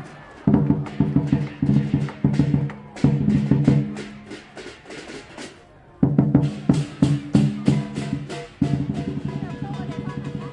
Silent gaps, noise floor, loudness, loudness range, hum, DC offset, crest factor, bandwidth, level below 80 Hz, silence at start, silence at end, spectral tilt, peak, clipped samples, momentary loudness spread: none; -47 dBFS; -22 LUFS; 3 LU; none; under 0.1%; 20 dB; 10 kHz; -44 dBFS; 0 s; 0 s; -8 dB/octave; -2 dBFS; under 0.1%; 18 LU